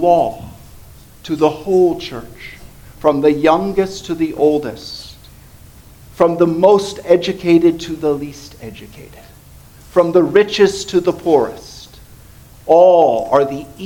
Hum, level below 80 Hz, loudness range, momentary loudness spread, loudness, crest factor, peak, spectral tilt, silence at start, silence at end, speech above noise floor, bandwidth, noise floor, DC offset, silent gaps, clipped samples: none; -44 dBFS; 4 LU; 22 LU; -14 LUFS; 16 dB; 0 dBFS; -6 dB/octave; 0 s; 0 s; 27 dB; 18.5 kHz; -41 dBFS; under 0.1%; none; under 0.1%